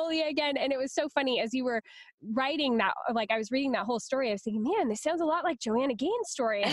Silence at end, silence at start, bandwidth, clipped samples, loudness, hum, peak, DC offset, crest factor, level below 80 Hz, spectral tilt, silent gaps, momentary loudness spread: 0 s; 0 s; 12 kHz; under 0.1%; -30 LUFS; none; -14 dBFS; under 0.1%; 16 dB; -72 dBFS; -3.5 dB/octave; 2.14-2.18 s; 3 LU